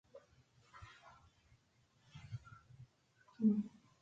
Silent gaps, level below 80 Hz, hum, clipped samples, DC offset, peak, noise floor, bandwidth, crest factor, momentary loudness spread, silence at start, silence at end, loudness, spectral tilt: none; -72 dBFS; none; under 0.1%; under 0.1%; -22 dBFS; -75 dBFS; 7.4 kHz; 22 dB; 28 LU; 0.15 s; 0.35 s; -40 LUFS; -8.5 dB/octave